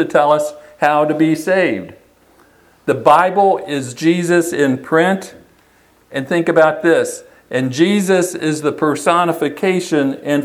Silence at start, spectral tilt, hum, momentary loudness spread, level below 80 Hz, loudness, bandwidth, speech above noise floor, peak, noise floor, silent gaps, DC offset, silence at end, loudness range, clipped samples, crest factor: 0 s; -5.5 dB/octave; none; 11 LU; -60 dBFS; -15 LUFS; 15.5 kHz; 37 dB; 0 dBFS; -52 dBFS; none; under 0.1%; 0 s; 2 LU; under 0.1%; 16 dB